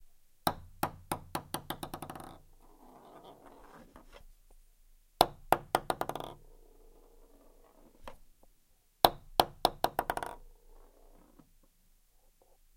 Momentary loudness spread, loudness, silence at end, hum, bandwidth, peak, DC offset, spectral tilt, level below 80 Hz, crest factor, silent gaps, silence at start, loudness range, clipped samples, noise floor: 27 LU; -34 LUFS; 2.3 s; none; 16.5 kHz; -2 dBFS; under 0.1%; -3.5 dB/octave; -56 dBFS; 38 dB; none; 0.45 s; 12 LU; under 0.1%; -67 dBFS